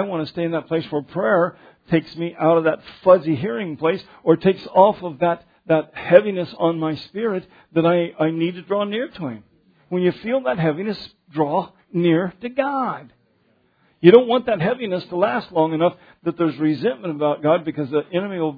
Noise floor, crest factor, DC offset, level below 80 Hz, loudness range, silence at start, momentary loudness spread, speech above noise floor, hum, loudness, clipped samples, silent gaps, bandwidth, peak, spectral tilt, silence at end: -62 dBFS; 20 dB; under 0.1%; -62 dBFS; 5 LU; 0 s; 11 LU; 42 dB; none; -20 LUFS; under 0.1%; none; 5 kHz; 0 dBFS; -9.5 dB/octave; 0 s